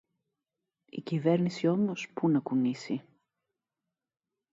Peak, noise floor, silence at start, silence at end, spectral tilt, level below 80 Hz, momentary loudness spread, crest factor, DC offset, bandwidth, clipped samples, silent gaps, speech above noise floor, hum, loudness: -14 dBFS; -89 dBFS; 0.95 s; 1.5 s; -7.5 dB/octave; -78 dBFS; 10 LU; 18 dB; under 0.1%; 7.8 kHz; under 0.1%; none; 60 dB; none; -30 LUFS